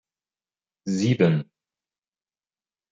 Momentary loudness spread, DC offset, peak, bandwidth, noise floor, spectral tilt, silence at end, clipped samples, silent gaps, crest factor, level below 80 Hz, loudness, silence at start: 18 LU; under 0.1%; -6 dBFS; 7.8 kHz; under -90 dBFS; -7 dB/octave; 1.5 s; under 0.1%; none; 22 dB; -68 dBFS; -23 LUFS; 0.85 s